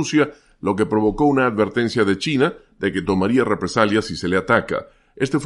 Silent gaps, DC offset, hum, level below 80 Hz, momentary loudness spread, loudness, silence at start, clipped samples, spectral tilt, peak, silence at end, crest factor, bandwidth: none; under 0.1%; none; -46 dBFS; 7 LU; -20 LUFS; 0 s; under 0.1%; -5.5 dB/octave; -2 dBFS; 0 s; 16 dB; 11.5 kHz